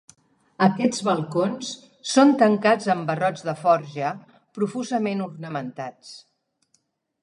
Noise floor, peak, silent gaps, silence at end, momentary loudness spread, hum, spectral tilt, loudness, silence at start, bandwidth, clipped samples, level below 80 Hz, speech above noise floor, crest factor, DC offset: -69 dBFS; -4 dBFS; none; 1.05 s; 17 LU; none; -5.5 dB/octave; -22 LUFS; 0.6 s; 11.5 kHz; under 0.1%; -74 dBFS; 47 dB; 20 dB; under 0.1%